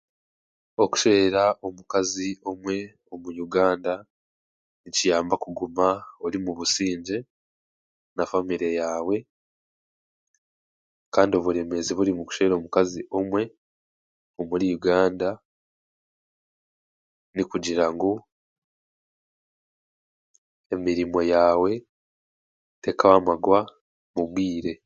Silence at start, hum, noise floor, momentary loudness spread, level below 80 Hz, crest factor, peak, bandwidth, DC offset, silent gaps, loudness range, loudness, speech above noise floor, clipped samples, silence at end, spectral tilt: 0.8 s; none; under -90 dBFS; 13 LU; -58 dBFS; 24 dB; -2 dBFS; 9.4 kHz; under 0.1%; 4.10-4.84 s, 7.30-8.16 s, 9.29-11.12 s, 13.57-14.34 s, 15.45-17.33 s, 18.32-20.70 s, 21.89-22.82 s, 23.81-24.14 s; 7 LU; -24 LUFS; over 67 dB; under 0.1%; 0.1 s; -4 dB/octave